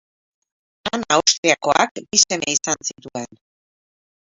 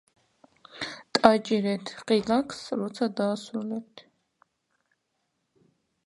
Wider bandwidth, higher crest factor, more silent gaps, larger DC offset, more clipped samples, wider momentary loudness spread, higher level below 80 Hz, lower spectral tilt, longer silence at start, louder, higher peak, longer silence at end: second, 8 kHz vs 11.5 kHz; second, 22 dB vs 28 dB; first, 1.38-1.43 s, 1.91-1.95 s vs none; neither; neither; about the same, 16 LU vs 16 LU; first, -60 dBFS vs -66 dBFS; second, -1 dB/octave vs -5 dB/octave; about the same, 0.85 s vs 0.75 s; first, -18 LUFS vs -27 LUFS; about the same, 0 dBFS vs 0 dBFS; second, 1.05 s vs 2.05 s